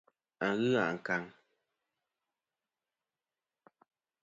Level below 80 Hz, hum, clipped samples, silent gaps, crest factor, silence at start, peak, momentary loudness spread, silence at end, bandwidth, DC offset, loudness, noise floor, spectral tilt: -80 dBFS; none; under 0.1%; none; 22 dB; 0.4 s; -16 dBFS; 7 LU; 2.95 s; 7.6 kHz; under 0.1%; -33 LUFS; under -90 dBFS; -6 dB/octave